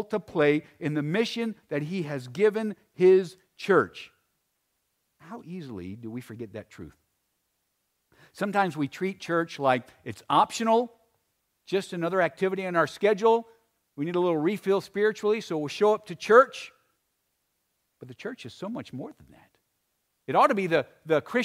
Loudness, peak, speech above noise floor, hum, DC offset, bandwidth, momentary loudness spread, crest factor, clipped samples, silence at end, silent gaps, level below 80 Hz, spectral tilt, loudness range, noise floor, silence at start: -26 LUFS; -6 dBFS; 51 dB; none; under 0.1%; 15 kHz; 18 LU; 22 dB; under 0.1%; 0 s; none; -72 dBFS; -6 dB/octave; 17 LU; -77 dBFS; 0 s